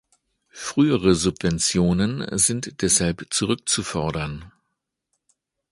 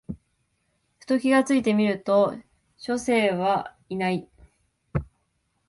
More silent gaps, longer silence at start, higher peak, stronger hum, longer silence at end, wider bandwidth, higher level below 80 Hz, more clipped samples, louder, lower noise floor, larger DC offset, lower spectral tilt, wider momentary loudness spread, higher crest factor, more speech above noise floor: neither; first, 0.55 s vs 0.1 s; first, -4 dBFS vs -8 dBFS; neither; first, 1.25 s vs 0.65 s; about the same, 11.5 kHz vs 11.5 kHz; first, -44 dBFS vs -50 dBFS; neither; first, -21 LUFS vs -24 LUFS; first, -79 dBFS vs -72 dBFS; neither; second, -4 dB/octave vs -6 dB/octave; second, 8 LU vs 15 LU; about the same, 20 dB vs 18 dB; first, 57 dB vs 50 dB